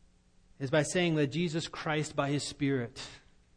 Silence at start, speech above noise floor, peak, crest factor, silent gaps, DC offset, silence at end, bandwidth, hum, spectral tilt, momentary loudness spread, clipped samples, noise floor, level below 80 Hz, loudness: 0.6 s; 31 dB; -14 dBFS; 18 dB; none; under 0.1%; 0.4 s; 10.5 kHz; none; -5 dB/octave; 12 LU; under 0.1%; -63 dBFS; -62 dBFS; -32 LUFS